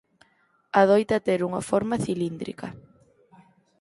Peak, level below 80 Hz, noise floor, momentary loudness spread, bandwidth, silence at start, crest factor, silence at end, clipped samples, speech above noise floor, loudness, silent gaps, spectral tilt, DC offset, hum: -4 dBFS; -60 dBFS; -66 dBFS; 16 LU; 11.5 kHz; 0.75 s; 22 dB; 1.05 s; under 0.1%; 42 dB; -24 LUFS; none; -6 dB/octave; under 0.1%; none